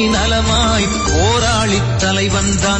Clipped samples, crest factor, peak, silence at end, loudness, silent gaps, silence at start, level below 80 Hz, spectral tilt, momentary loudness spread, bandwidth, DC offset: under 0.1%; 12 dB; -2 dBFS; 0 s; -14 LUFS; none; 0 s; -24 dBFS; -4 dB/octave; 2 LU; 10 kHz; under 0.1%